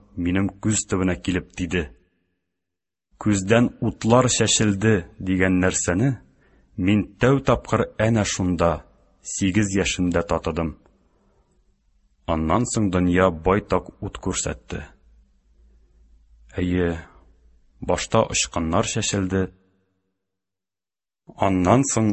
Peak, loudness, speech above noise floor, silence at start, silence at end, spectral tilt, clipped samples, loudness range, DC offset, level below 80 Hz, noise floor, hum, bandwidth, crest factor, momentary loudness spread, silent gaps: -2 dBFS; -22 LUFS; over 69 dB; 0.15 s; 0 s; -5 dB/octave; under 0.1%; 7 LU; under 0.1%; -40 dBFS; under -90 dBFS; none; 8.6 kHz; 22 dB; 12 LU; none